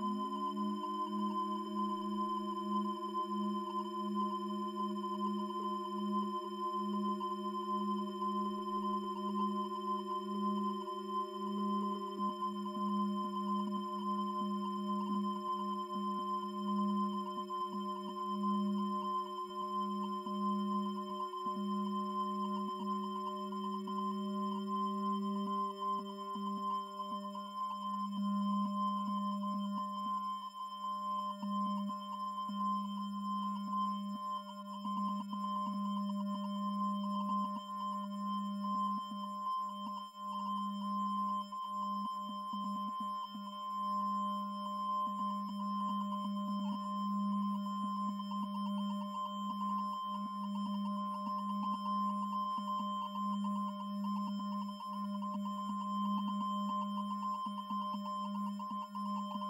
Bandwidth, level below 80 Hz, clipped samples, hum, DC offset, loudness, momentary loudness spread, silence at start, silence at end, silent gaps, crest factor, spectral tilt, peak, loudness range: 13 kHz; under -90 dBFS; under 0.1%; none; under 0.1%; -38 LUFS; 4 LU; 0 s; 0 s; none; 12 dB; -7 dB/octave; -26 dBFS; 2 LU